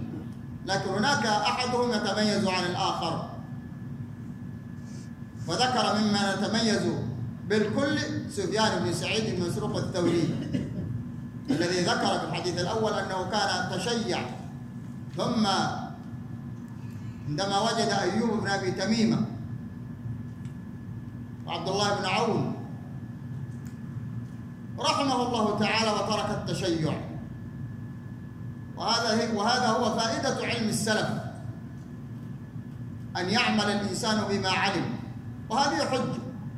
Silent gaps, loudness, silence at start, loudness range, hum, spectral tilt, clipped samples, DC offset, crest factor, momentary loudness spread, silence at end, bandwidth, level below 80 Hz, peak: none; -28 LUFS; 0 s; 4 LU; none; -4.5 dB/octave; under 0.1%; under 0.1%; 20 dB; 15 LU; 0 s; 15 kHz; -56 dBFS; -8 dBFS